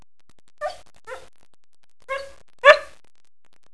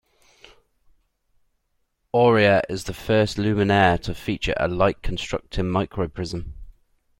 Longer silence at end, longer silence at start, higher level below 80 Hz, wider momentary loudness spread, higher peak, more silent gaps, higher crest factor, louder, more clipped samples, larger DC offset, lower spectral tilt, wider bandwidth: first, 0.9 s vs 0.5 s; second, 0.6 s vs 2.15 s; second, -62 dBFS vs -40 dBFS; first, 27 LU vs 12 LU; first, 0 dBFS vs -4 dBFS; neither; about the same, 24 dB vs 20 dB; first, -19 LUFS vs -22 LUFS; neither; first, 0.8% vs under 0.1%; second, -0.5 dB/octave vs -6 dB/octave; second, 11 kHz vs 16.5 kHz